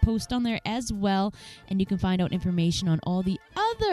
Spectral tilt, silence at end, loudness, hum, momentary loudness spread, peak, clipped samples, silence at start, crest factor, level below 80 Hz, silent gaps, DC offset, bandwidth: -6 dB/octave; 0 s; -27 LUFS; none; 5 LU; -8 dBFS; under 0.1%; 0 s; 18 dB; -38 dBFS; none; under 0.1%; 12.5 kHz